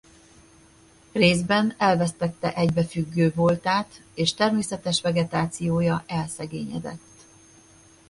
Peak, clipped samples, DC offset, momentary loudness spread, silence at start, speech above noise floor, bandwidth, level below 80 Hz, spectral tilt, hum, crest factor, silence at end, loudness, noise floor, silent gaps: -4 dBFS; under 0.1%; under 0.1%; 11 LU; 1.15 s; 31 dB; 11.5 kHz; -54 dBFS; -5.5 dB/octave; none; 20 dB; 1.1 s; -24 LUFS; -54 dBFS; none